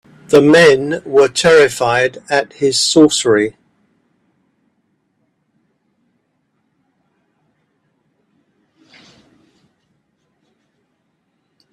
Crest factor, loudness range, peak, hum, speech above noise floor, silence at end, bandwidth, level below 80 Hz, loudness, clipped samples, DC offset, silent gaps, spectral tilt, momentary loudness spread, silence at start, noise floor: 16 dB; 9 LU; 0 dBFS; none; 55 dB; 8.25 s; 13.5 kHz; -56 dBFS; -12 LUFS; under 0.1%; under 0.1%; none; -3.5 dB/octave; 8 LU; 0.3 s; -66 dBFS